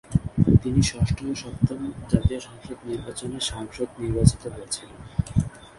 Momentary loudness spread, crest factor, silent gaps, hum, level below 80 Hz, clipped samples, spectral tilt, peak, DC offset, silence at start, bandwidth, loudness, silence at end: 14 LU; 24 dB; none; none; -36 dBFS; under 0.1%; -6 dB/octave; -2 dBFS; under 0.1%; 0.1 s; 11.5 kHz; -25 LUFS; 0.1 s